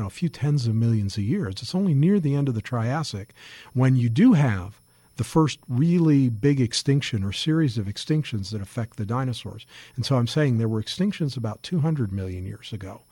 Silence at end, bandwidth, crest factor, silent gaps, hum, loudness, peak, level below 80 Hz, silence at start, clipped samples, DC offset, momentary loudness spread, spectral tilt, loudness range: 0.15 s; 17 kHz; 14 dB; none; none; -24 LUFS; -8 dBFS; -54 dBFS; 0 s; under 0.1%; under 0.1%; 14 LU; -6.5 dB/octave; 5 LU